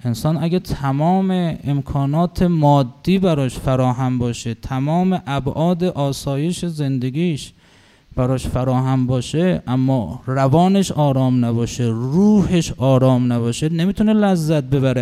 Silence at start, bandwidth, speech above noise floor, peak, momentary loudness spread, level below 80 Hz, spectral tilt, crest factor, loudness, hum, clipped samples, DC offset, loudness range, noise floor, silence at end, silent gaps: 0.05 s; 14 kHz; 33 dB; -2 dBFS; 7 LU; -40 dBFS; -7 dB/octave; 14 dB; -18 LUFS; none; under 0.1%; under 0.1%; 5 LU; -50 dBFS; 0 s; none